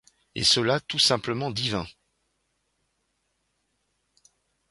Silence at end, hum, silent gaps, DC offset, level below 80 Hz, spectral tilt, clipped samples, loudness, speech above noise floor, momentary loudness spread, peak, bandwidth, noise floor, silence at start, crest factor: 2.8 s; none; none; under 0.1%; -58 dBFS; -3 dB/octave; under 0.1%; -23 LUFS; 50 dB; 13 LU; -8 dBFS; 11.5 kHz; -75 dBFS; 0.35 s; 22 dB